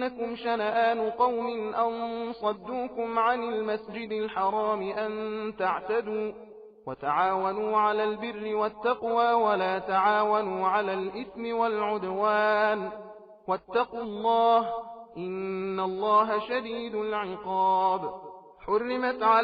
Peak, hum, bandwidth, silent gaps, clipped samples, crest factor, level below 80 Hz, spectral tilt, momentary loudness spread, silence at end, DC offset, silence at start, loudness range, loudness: -10 dBFS; none; 5.4 kHz; none; under 0.1%; 16 dB; -66 dBFS; -7.5 dB/octave; 11 LU; 0 s; under 0.1%; 0 s; 4 LU; -28 LUFS